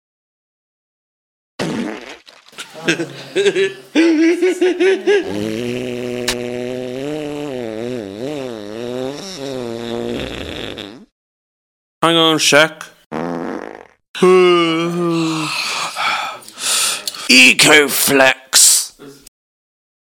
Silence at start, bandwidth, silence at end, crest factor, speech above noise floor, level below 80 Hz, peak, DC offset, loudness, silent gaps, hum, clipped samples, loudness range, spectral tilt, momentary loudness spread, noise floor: 1.6 s; 18.5 kHz; 0.9 s; 18 dB; 26 dB; -52 dBFS; 0 dBFS; under 0.1%; -14 LUFS; 11.12-12.01 s, 13.06-13.10 s, 14.08-14.14 s; none; under 0.1%; 14 LU; -2.5 dB/octave; 18 LU; -39 dBFS